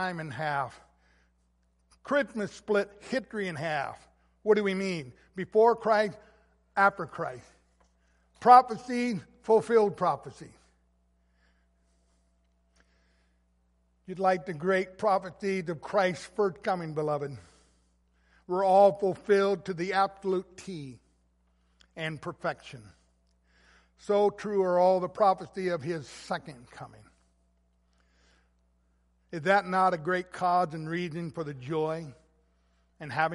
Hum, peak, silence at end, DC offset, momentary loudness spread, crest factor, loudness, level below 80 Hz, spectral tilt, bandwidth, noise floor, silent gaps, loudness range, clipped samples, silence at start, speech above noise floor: none; -4 dBFS; 0 s; under 0.1%; 16 LU; 26 dB; -28 LUFS; -66 dBFS; -6 dB/octave; 11.5 kHz; -70 dBFS; none; 11 LU; under 0.1%; 0 s; 42 dB